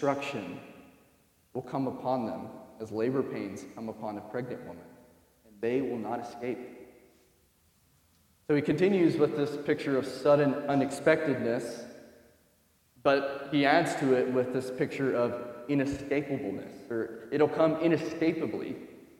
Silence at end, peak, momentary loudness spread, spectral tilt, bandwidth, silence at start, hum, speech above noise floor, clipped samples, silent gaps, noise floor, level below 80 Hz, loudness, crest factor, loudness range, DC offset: 0.2 s; -10 dBFS; 16 LU; -6.5 dB/octave; 16 kHz; 0 s; none; 38 dB; under 0.1%; none; -67 dBFS; -66 dBFS; -30 LUFS; 22 dB; 9 LU; under 0.1%